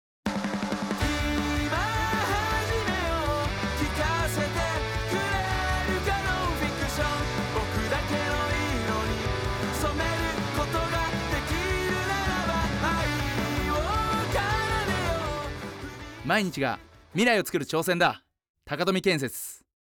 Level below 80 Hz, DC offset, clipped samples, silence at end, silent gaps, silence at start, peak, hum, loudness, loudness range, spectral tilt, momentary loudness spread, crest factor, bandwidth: -38 dBFS; under 0.1%; under 0.1%; 0.4 s; 18.49-18.54 s; 0.25 s; -12 dBFS; none; -27 LUFS; 1 LU; -4.5 dB/octave; 5 LU; 16 dB; over 20 kHz